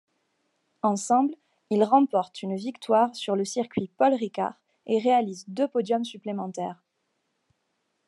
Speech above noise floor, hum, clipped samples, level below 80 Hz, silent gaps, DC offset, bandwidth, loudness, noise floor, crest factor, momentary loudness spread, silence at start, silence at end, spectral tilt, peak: 51 dB; none; under 0.1%; -76 dBFS; none; under 0.1%; 11.5 kHz; -26 LUFS; -76 dBFS; 20 dB; 11 LU; 0.85 s; 1.35 s; -5.5 dB/octave; -8 dBFS